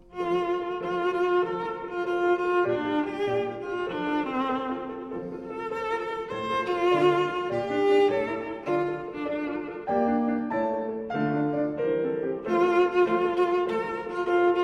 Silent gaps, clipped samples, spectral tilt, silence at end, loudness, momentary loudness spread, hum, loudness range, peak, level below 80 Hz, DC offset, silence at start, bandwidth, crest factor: none; under 0.1%; -7 dB/octave; 0 s; -27 LUFS; 10 LU; none; 4 LU; -10 dBFS; -60 dBFS; under 0.1%; 0.1 s; 7.6 kHz; 16 dB